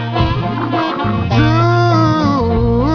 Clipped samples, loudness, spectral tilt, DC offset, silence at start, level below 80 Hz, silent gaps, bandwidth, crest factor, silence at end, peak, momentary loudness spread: under 0.1%; -14 LUFS; -8 dB/octave; under 0.1%; 0 s; -28 dBFS; none; 5.4 kHz; 12 dB; 0 s; 0 dBFS; 5 LU